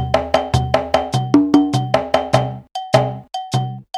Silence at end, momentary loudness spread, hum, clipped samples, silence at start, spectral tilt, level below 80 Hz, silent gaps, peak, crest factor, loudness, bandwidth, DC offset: 0 s; 9 LU; none; under 0.1%; 0 s; -6.5 dB/octave; -38 dBFS; none; 0 dBFS; 18 dB; -17 LUFS; 12.5 kHz; under 0.1%